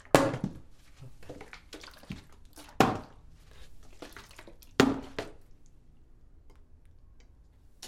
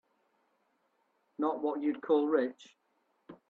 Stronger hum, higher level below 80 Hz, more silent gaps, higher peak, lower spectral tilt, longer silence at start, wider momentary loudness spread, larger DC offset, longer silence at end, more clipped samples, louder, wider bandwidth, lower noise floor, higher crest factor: neither; first, -54 dBFS vs -86 dBFS; neither; first, 0 dBFS vs -16 dBFS; second, -5 dB/octave vs -6.5 dB/octave; second, 0.15 s vs 1.4 s; first, 26 LU vs 9 LU; neither; second, 0 s vs 0.15 s; neither; about the same, -30 LUFS vs -32 LUFS; first, 16.5 kHz vs 7.4 kHz; second, -57 dBFS vs -76 dBFS; first, 34 dB vs 20 dB